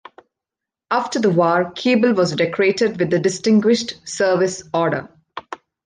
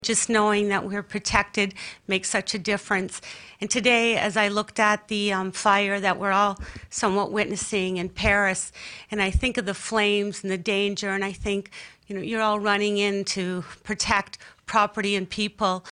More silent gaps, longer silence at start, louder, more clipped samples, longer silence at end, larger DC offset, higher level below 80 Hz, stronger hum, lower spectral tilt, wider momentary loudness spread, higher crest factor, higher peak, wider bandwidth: neither; first, 0.9 s vs 0 s; first, -18 LUFS vs -24 LUFS; neither; first, 0.3 s vs 0 s; neither; second, -60 dBFS vs -44 dBFS; neither; first, -5 dB/octave vs -3 dB/octave; about the same, 13 LU vs 12 LU; second, 14 dB vs 20 dB; about the same, -4 dBFS vs -4 dBFS; about the same, 9.8 kHz vs 10.5 kHz